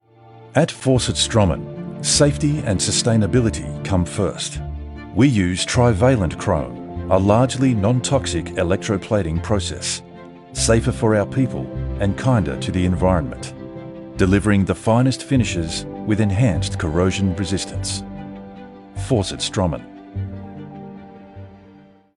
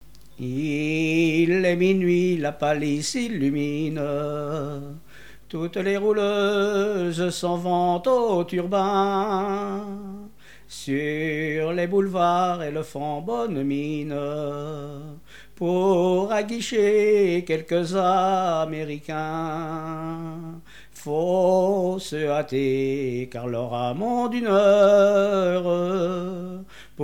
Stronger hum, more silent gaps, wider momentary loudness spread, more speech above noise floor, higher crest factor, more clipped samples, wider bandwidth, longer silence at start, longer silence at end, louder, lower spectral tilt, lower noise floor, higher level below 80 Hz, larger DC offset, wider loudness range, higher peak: neither; neither; first, 18 LU vs 13 LU; first, 29 dB vs 24 dB; about the same, 18 dB vs 16 dB; neither; second, 11.5 kHz vs 16.5 kHz; about the same, 0.35 s vs 0.4 s; first, 0.55 s vs 0 s; first, -19 LUFS vs -23 LUFS; about the same, -5.5 dB/octave vs -6 dB/octave; about the same, -47 dBFS vs -47 dBFS; first, -36 dBFS vs -56 dBFS; second, under 0.1% vs 0.5%; about the same, 6 LU vs 6 LU; first, 0 dBFS vs -8 dBFS